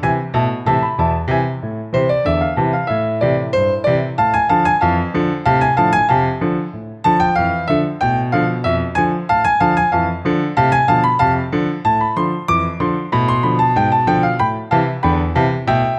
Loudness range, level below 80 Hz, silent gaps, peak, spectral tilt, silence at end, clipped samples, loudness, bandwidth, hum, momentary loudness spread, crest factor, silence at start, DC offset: 2 LU; -36 dBFS; none; -2 dBFS; -8 dB/octave; 0 s; under 0.1%; -17 LUFS; 8.6 kHz; none; 5 LU; 14 dB; 0 s; under 0.1%